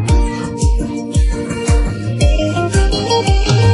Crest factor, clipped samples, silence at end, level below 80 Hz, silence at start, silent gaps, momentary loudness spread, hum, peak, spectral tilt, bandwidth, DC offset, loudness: 12 dB; under 0.1%; 0 s; -16 dBFS; 0 s; none; 5 LU; none; -2 dBFS; -5.5 dB/octave; 11.5 kHz; under 0.1%; -16 LUFS